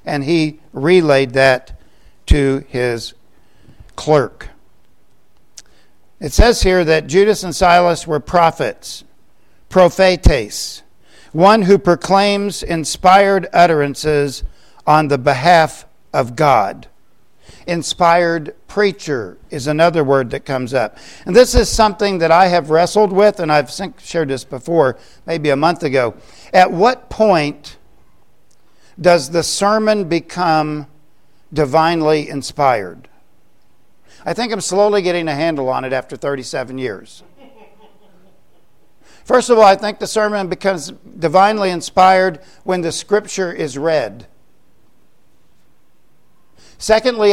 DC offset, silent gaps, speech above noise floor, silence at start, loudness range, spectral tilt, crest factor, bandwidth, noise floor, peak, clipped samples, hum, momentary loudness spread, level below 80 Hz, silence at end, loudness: 0.7%; none; 45 dB; 0.05 s; 8 LU; -5 dB/octave; 16 dB; 16 kHz; -60 dBFS; 0 dBFS; under 0.1%; none; 13 LU; -30 dBFS; 0 s; -15 LUFS